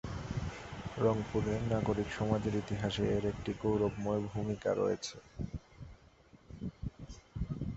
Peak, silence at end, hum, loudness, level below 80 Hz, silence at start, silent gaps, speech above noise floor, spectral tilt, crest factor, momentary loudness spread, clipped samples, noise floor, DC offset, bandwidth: -16 dBFS; 0 s; none; -36 LUFS; -50 dBFS; 0.05 s; none; 28 dB; -6.5 dB/octave; 20 dB; 13 LU; under 0.1%; -61 dBFS; under 0.1%; 8 kHz